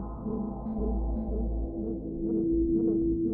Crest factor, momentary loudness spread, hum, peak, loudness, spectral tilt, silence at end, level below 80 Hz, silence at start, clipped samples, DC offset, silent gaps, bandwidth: 12 dB; 8 LU; none; -18 dBFS; -31 LUFS; -15 dB/octave; 0 s; -36 dBFS; 0 s; under 0.1%; under 0.1%; none; 1.5 kHz